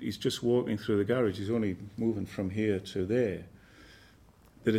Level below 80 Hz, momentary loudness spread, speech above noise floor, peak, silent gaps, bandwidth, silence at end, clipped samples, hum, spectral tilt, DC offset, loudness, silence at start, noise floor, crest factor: -62 dBFS; 6 LU; 29 dB; -14 dBFS; none; 15.5 kHz; 0 s; under 0.1%; none; -6.5 dB/octave; under 0.1%; -31 LUFS; 0 s; -59 dBFS; 18 dB